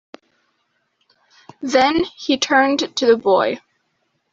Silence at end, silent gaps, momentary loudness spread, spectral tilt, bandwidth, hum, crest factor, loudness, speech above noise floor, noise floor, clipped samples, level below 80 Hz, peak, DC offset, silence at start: 0.75 s; none; 8 LU; -3 dB/octave; 7.8 kHz; none; 18 dB; -17 LUFS; 52 dB; -69 dBFS; under 0.1%; -58 dBFS; -2 dBFS; under 0.1%; 1.6 s